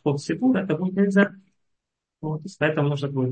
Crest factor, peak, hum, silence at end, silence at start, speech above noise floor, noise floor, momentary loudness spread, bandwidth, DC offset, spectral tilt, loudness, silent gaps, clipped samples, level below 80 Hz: 18 dB; -6 dBFS; none; 0 s; 0.05 s; 58 dB; -80 dBFS; 11 LU; 8.8 kHz; under 0.1%; -7.5 dB/octave; -23 LUFS; none; under 0.1%; -64 dBFS